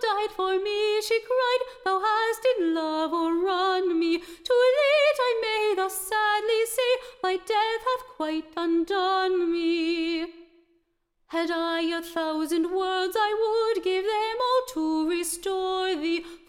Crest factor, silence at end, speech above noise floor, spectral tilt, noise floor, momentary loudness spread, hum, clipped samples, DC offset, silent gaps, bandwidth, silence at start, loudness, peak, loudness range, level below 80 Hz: 14 dB; 0.1 s; 47 dB; -1.5 dB/octave; -73 dBFS; 6 LU; none; under 0.1%; under 0.1%; none; 17 kHz; 0 s; -25 LUFS; -12 dBFS; 4 LU; -62 dBFS